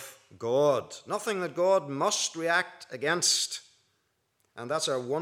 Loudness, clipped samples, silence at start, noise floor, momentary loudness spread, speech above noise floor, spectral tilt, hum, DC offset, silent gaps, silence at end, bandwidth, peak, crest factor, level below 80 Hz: -28 LUFS; under 0.1%; 0 s; -75 dBFS; 13 LU; 47 dB; -2 dB/octave; none; under 0.1%; none; 0 s; 16.5 kHz; -12 dBFS; 18 dB; -86 dBFS